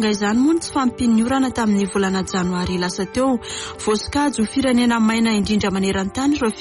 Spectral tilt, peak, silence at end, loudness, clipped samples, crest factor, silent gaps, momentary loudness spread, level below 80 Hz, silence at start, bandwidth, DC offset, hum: -5 dB/octave; -8 dBFS; 0 s; -19 LUFS; under 0.1%; 10 dB; none; 5 LU; -42 dBFS; 0 s; 11.5 kHz; under 0.1%; none